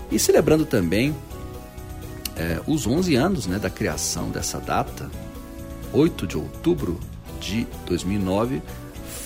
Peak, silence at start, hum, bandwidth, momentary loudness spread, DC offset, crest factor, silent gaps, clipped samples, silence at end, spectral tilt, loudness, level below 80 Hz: -4 dBFS; 0 s; none; 16 kHz; 17 LU; under 0.1%; 18 dB; none; under 0.1%; 0 s; -5 dB/octave; -23 LUFS; -38 dBFS